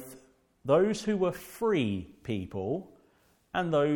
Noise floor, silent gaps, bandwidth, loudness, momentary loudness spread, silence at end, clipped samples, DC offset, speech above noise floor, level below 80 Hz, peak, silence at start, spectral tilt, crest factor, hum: -66 dBFS; none; 18 kHz; -30 LUFS; 11 LU; 0 s; under 0.1%; under 0.1%; 38 dB; -62 dBFS; -10 dBFS; 0 s; -6.5 dB/octave; 20 dB; none